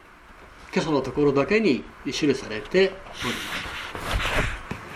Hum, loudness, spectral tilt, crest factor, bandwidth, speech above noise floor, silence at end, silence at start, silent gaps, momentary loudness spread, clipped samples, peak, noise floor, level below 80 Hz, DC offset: none; -25 LUFS; -5 dB/octave; 18 dB; 15 kHz; 24 dB; 0 s; 0.1 s; none; 10 LU; under 0.1%; -8 dBFS; -48 dBFS; -40 dBFS; under 0.1%